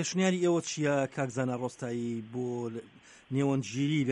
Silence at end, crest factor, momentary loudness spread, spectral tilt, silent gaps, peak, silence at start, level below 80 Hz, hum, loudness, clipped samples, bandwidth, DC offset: 0 s; 16 dB; 8 LU; -5.5 dB/octave; none; -14 dBFS; 0 s; -72 dBFS; none; -31 LUFS; under 0.1%; 11 kHz; under 0.1%